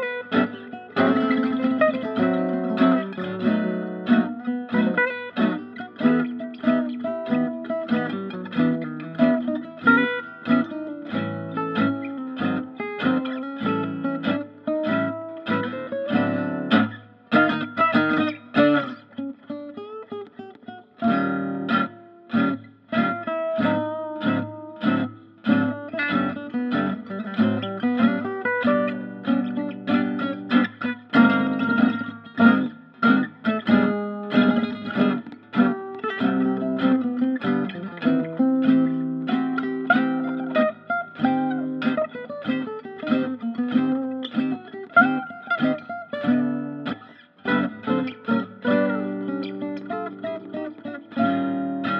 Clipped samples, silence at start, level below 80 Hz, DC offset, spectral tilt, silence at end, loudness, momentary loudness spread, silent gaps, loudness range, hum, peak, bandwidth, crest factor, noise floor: under 0.1%; 0 s; -70 dBFS; under 0.1%; -9 dB/octave; 0 s; -23 LUFS; 11 LU; none; 5 LU; none; -4 dBFS; 5.6 kHz; 20 dB; -47 dBFS